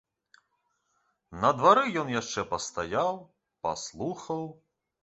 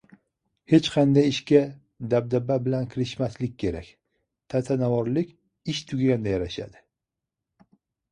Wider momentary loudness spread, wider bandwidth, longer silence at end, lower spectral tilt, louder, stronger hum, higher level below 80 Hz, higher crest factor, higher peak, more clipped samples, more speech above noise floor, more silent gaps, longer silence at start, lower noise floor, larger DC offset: about the same, 14 LU vs 14 LU; second, 8.2 kHz vs 10 kHz; second, 0.5 s vs 1.45 s; second, -4 dB/octave vs -7 dB/octave; second, -28 LUFS vs -25 LUFS; neither; second, -62 dBFS vs -52 dBFS; about the same, 24 dB vs 20 dB; about the same, -6 dBFS vs -4 dBFS; neither; second, 48 dB vs 63 dB; neither; first, 1.3 s vs 0.7 s; second, -76 dBFS vs -86 dBFS; neither